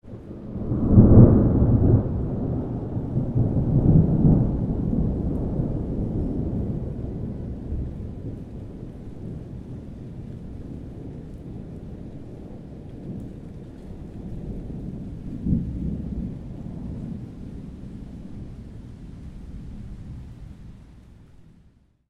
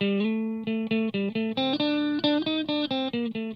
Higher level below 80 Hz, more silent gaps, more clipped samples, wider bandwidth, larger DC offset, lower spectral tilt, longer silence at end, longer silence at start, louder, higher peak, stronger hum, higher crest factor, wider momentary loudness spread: first, -32 dBFS vs -72 dBFS; neither; neither; second, 3.4 kHz vs 6 kHz; neither; first, -12 dB/octave vs -7.5 dB/octave; first, 0.65 s vs 0 s; about the same, 0.05 s vs 0 s; first, -23 LUFS vs -27 LUFS; first, 0 dBFS vs -12 dBFS; neither; first, 24 dB vs 16 dB; first, 21 LU vs 5 LU